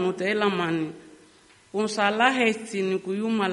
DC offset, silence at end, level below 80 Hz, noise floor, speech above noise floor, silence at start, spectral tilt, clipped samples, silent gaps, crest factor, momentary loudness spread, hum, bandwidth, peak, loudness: under 0.1%; 0 s; -70 dBFS; -55 dBFS; 31 dB; 0 s; -4.5 dB/octave; under 0.1%; none; 20 dB; 9 LU; none; 11.5 kHz; -4 dBFS; -25 LUFS